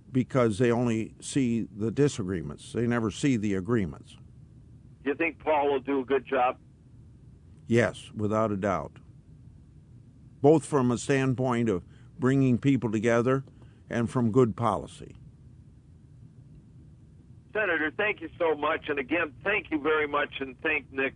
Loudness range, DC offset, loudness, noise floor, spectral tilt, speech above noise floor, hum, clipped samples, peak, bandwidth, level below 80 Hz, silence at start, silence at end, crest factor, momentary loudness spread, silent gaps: 5 LU; under 0.1%; -27 LUFS; -53 dBFS; -6.5 dB/octave; 26 dB; none; under 0.1%; -8 dBFS; 10.5 kHz; -58 dBFS; 0.1 s; 0.05 s; 20 dB; 9 LU; none